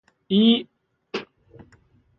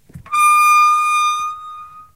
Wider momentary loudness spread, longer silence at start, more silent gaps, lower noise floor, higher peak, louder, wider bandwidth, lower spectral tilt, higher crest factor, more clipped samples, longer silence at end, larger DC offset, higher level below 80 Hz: about the same, 16 LU vs 18 LU; first, 0.3 s vs 0.15 s; neither; first, -58 dBFS vs -35 dBFS; second, -8 dBFS vs -4 dBFS; second, -21 LUFS vs -13 LUFS; second, 6.2 kHz vs 15.5 kHz; first, -7 dB/octave vs 1 dB/octave; first, 18 dB vs 12 dB; neither; first, 0.95 s vs 0.15 s; second, under 0.1% vs 0.2%; second, -64 dBFS vs -58 dBFS